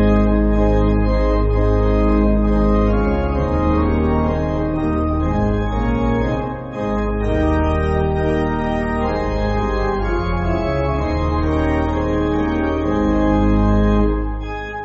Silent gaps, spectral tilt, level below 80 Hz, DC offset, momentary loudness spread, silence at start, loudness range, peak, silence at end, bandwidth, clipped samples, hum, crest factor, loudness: none; -7.5 dB/octave; -22 dBFS; under 0.1%; 4 LU; 0 s; 3 LU; -4 dBFS; 0 s; 7 kHz; under 0.1%; none; 12 dB; -18 LUFS